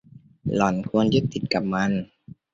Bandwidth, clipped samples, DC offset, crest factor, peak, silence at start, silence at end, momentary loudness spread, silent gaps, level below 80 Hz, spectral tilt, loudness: 7.8 kHz; under 0.1%; under 0.1%; 20 dB; -4 dBFS; 0.15 s; 0.2 s; 9 LU; none; -52 dBFS; -6.5 dB/octave; -24 LUFS